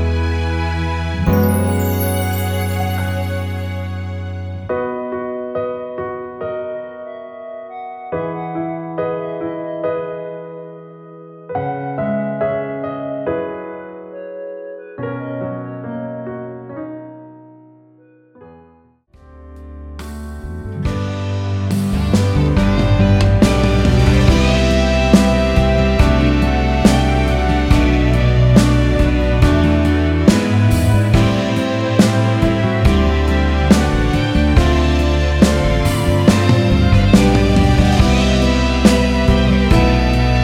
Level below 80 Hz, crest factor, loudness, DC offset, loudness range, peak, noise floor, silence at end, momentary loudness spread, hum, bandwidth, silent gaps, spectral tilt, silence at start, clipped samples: -22 dBFS; 16 dB; -16 LUFS; under 0.1%; 14 LU; 0 dBFS; -51 dBFS; 0 s; 17 LU; none; 19 kHz; none; -6.5 dB/octave; 0 s; under 0.1%